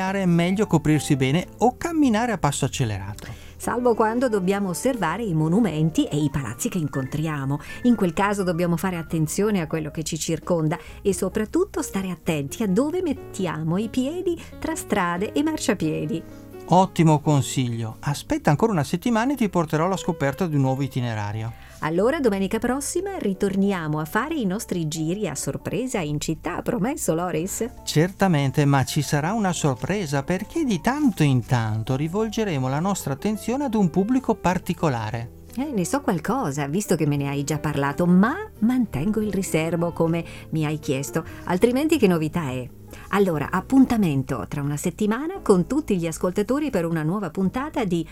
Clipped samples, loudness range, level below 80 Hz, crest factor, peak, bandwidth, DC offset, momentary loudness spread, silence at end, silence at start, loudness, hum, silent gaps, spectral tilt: under 0.1%; 3 LU; -46 dBFS; 20 dB; -2 dBFS; 16.5 kHz; under 0.1%; 8 LU; 0 s; 0 s; -23 LUFS; none; none; -6 dB/octave